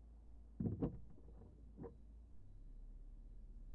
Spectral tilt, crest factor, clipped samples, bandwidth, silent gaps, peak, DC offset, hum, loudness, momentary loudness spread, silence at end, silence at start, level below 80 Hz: -11.5 dB/octave; 22 dB; under 0.1%; 3.9 kHz; none; -28 dBFS; under 0.1%; none; -51 LUFS; 18 LU; 0 s; 0 s; -58 dBFS